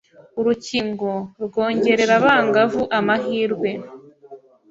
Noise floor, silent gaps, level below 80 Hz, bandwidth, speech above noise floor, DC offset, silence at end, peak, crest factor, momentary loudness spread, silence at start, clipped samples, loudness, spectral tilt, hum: -44 dBFS; none; -58 dBFS; 8 kHz; 25 dB; under 0.1%; 0.35 s; -2 dBFS; 18 dB; 11 LU; 0.35 s; under 0.1%; -19 LUFS; -5 dB/octave; none